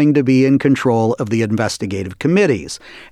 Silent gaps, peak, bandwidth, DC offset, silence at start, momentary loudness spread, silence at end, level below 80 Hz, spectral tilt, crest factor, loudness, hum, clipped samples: none; -4 dBFS; 12.5 kHz; under 0.1%; 0 s; 10 LU; 0.05 s; -50 dBFS; -6.5 dB/octave; 12 dB; -16 LUFS; none; under 0.1%